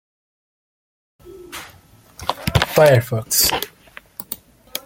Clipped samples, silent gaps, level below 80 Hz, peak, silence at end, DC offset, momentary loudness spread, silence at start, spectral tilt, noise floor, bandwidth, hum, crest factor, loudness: under 0.1%; none; -42 dBFS; 0 dBFS; 0.05 s; under 0.1%; 21 LU; 1.25 s; -3.5 dB/octave; -48 dBFS; 17 kHz; none; 22 dB; -17 LUFS